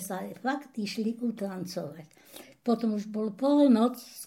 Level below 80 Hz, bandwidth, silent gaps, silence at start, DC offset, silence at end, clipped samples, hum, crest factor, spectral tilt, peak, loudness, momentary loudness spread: -80 dBFS; 16.5 kHz; none; 0 s; under 0.1%; 0 s; under 0.1%; none; 16 dB; -5.5 dB/octave; -12 dBFS; -29 LUFS; 21 LU